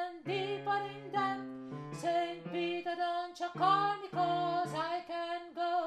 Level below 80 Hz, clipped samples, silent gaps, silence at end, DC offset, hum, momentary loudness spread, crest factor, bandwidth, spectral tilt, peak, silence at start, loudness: -78 dBFS; under 0.1%; none; 0 s; under 0.1%; none; 9 LU; 16 dB; 12 kHz; -5.5 dB/octave; -18 dBFS; 0 s; -35 LUFS